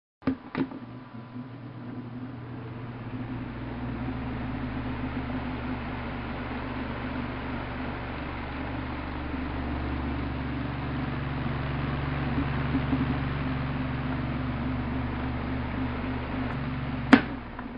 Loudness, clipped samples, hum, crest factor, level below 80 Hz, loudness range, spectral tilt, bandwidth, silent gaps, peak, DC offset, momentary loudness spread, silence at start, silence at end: -31 LUFS; under 0.1%; none; 30 dB; -40 dBFS; 7 LU; -8.5 dB/octave; 7.2 kHz; none; 0 dBFS; under 0.1%; 10 LU; 0.2 s; 0 s